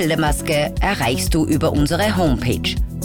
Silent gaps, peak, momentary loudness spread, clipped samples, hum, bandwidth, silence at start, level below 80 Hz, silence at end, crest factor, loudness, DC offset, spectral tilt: none; -8 dBFS; 3 LU; under 0.1%; none; over 20 kHz; 0 s; -26 dBFS; 0 s; 10 dB; -18 LUFS; under 0.1%; -5 dB/octave